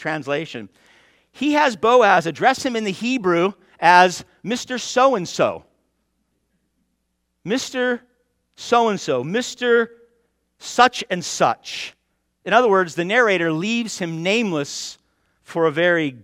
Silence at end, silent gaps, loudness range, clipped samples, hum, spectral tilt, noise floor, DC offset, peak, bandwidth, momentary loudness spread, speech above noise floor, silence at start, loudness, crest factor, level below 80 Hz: 0.05 s; none; 7 LU; under 0.1%; none; -4 dB/octave; -72 dBFS; under 0.1%; 0 dBFS; 15.5 kHz; 15 LU; 53 dB; 0 s; -19 LUFS; 20 dB; -64 dBFS